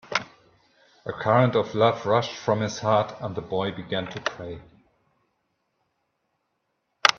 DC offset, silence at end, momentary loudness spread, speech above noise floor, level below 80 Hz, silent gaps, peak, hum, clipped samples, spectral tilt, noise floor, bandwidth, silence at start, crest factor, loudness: under 0.1%; 0 s; 16 LU; 52 dB; -62 dBFS; none; 0 dBFS; none; under 0.1%; -5 dB/octave; -76 dBFS; 12 kHz; 0.05 s; 26 dB; -25 LUFS